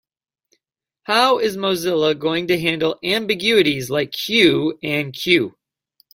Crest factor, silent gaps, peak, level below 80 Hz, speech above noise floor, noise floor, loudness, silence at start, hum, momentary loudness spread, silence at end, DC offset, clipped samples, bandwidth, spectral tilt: 20 dB; none; 0 dBFS; -58 dBFS; 59 dB; -77 dBFS; -18 LUFS; 1.1 s; none; 7 LU; 0.65 s; under 0.1%; under 0.1%; 16.5 kHz; -4.5 dB/octave